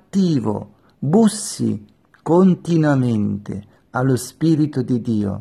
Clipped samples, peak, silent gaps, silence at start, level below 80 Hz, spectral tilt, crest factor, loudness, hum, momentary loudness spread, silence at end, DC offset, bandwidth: under 0.1%; -4 dBFS; none; 0.15 s; -56 dBFS; -7 dB/octave; 14 dB; -19 LUFS; none; 13 LU; 0 s; under 0.1%; 13.5 kHz